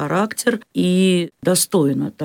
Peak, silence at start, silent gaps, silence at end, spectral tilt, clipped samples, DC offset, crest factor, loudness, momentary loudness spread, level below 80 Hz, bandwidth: -4 dBFS; 0 s; none; 0 s; -4.5 dB/octave; under 0.1%; under 0.1%; 14 dB; -18 LUFS; 5 LU; -64 dBFS; 18.5 kHz